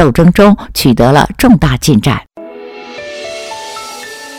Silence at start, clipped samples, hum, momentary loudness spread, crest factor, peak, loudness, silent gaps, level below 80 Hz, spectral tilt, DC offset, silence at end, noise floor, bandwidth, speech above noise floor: 0 s; 2%; none; 20 LU; 10 dB; 0 dBFS; -9 LUFS; none; -28 dBFS; -6 dB/octave; under 0.1%; 0 s; -29 dBFS; 18 kHz; 21 dB